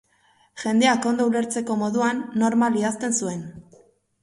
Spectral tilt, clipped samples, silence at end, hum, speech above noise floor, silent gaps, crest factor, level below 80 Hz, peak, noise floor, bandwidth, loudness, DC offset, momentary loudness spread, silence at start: -4 dB/octave; under 0.1%; 0.6 s; none; 39 dB; none; 18 dB; -66 dBFS; -6 dBFS; -61 dBFS; 11.5 kHz; -22 LUFS; under 0.1%; 11 LU; 0.55 s